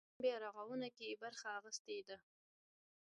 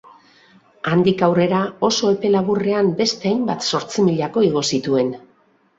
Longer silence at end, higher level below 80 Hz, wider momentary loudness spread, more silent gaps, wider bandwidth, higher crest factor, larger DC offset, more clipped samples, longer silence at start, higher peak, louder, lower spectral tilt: first, 0.95 s vs 0.6 s; second, under -90 dBFS vs -58 dBFS; first, 8 LU vs 4 LU; first, 1.79-1.85 s vs none; first, 11 kHz vs 8 kHz; about the same, 20 dB vs 16 dB; neither; neither; second, 0.2 s vs 0.85 s; second, -28 dBFS vs -2 dBFS; second, -47 LUFS vs -18 LUFS; second, -2.5 dB/octave vs -5 dB/octave